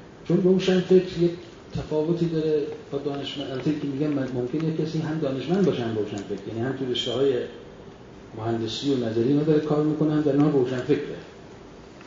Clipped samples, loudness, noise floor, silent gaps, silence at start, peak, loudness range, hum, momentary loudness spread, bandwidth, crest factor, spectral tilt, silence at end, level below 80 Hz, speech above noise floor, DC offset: under 0.1%; -25 LUFS; -44 dBFS; none; 0 s; -8 dBFS; 4 LU; none; 18 LU; 7.6 kHz; 18 dB; -7 dB/octave; 0 s; -54 dBFS; 20 dB; under 0.1%